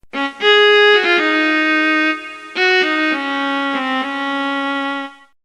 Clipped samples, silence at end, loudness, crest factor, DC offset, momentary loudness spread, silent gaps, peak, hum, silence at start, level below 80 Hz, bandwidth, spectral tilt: under 0.1%; 0.3 s; -14 LUFS; 14 dB; under 0.1%; 13 LU; none; -2 dBFS; none; 0.15 s; -60 dBFS; 10.5 kHz; -2 dB/octave